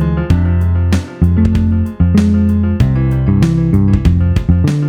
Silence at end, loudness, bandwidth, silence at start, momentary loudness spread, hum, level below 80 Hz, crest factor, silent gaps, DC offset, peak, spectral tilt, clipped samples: 0 s; -13 LUFS; 9.8 kHz; 0 s; 3 LU; none; -20 dBFS; 10 dB; none; under 0.1%; 0 dBFS; -8.5 dB/octave; under 0.1%